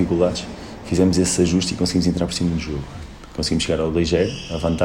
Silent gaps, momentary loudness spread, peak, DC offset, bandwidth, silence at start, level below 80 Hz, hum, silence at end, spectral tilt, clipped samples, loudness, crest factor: none; 15 LU; -4 dBFS; under 0.1%; 14 kHz; 0 s; -38 dBFS; none; 0 s; -5 dB/octave; under 0.1%; -20 LUFS; 16 dB